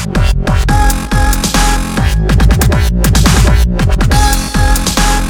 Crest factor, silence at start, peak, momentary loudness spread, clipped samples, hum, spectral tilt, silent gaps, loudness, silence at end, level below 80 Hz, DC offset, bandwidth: 10 dB; 0 s; 0 dBFS; 4 LU; 0.3%; none; -4.5 dB/octave; none; -11 LUFS; 0 s; -12 dBFS; under 0.1%; 19.5 kHz